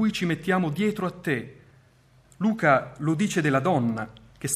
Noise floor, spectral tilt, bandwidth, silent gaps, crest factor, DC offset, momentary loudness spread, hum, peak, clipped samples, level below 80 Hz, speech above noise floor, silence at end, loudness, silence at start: -58 dBFS; -5.5 dB/octave; 15 kHz; none; 20 dB; under 0.1%; 10 LU; none; -6 dBFS; under 0.1%; -60 dBFS; 34 dB; 0 s; -25 LUFS; 0 s